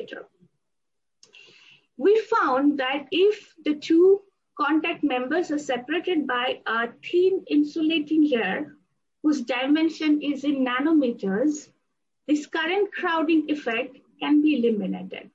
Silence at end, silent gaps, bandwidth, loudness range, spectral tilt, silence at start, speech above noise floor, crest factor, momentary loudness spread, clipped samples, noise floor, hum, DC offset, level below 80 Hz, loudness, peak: 0.1 s; none; 7.8 kHz; 2 LU; -5 dB/octave; 0 s; 63 dB; 14 dB; 8 LU; under 0.1%; -86 dBFS; none; under 0.1%; -76 dBFS; -23 LUFS; -10 dBFS